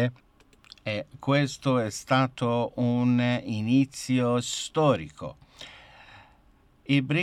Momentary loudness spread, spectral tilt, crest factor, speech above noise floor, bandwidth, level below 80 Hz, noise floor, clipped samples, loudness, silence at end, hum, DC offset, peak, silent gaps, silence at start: 17 LU; -6 dB/octave; 16 dB; 34 dB; 13.5 kHz; -62 dBFS; -60 dBFS; under 0.1%; -26 LUFS; 0 s; none; under 0.1%; -10 dBFS; none; 0 s